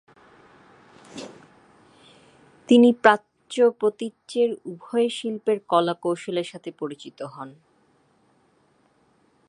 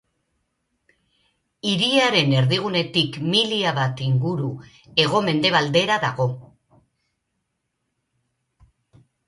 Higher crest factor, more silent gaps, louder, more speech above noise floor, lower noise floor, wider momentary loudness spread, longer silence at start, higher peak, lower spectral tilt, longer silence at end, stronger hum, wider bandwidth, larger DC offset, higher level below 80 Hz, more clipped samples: about the same, 24 dB vs 20 dB; neither; about the same, -22 LUFS vs -20 LUFS; second, 41 dB vs 56 dB; second, -63 dBFS vs -76 dBFS; first, 24 LU vs 9 LU; second, 1.15 s vs 1.65 s; first, 0 dBFS vs -4 dBFS; about the same, -5 dB/octave vs -5 dB/octave; second, 2 s vs 2.85 s; neither; about the same, 11 kHz vs 11.5 kHz; neither; second, -76 dBFS vs -60 dBFS; neither